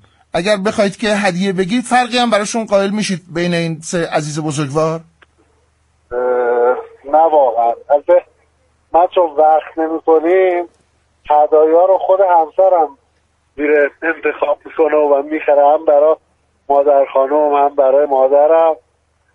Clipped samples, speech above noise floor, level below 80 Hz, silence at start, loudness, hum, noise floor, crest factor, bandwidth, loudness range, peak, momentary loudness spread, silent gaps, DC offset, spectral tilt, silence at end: under 0.1%; 47 dB; -54 dBFS; 0.35 s; -14 LUFS; none; -59 dBFS; 12 dB; 11.5 kHz; 5 LU; 0 dBFS; 8 LU; none; under 0.1%; -5 dB/octave; 0.6 s